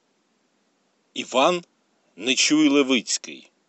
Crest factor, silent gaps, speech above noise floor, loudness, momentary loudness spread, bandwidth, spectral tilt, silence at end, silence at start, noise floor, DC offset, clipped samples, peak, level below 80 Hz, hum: 20 dB; none; 47 dB; -21 LUFS; 16 LU; 8.8 kHz; -2 dB/octave; 0.3 s; 1.15 s; -68 dBFS; under 0.1%; under 0.1%; -4 dBFS; under -90 dBFS; none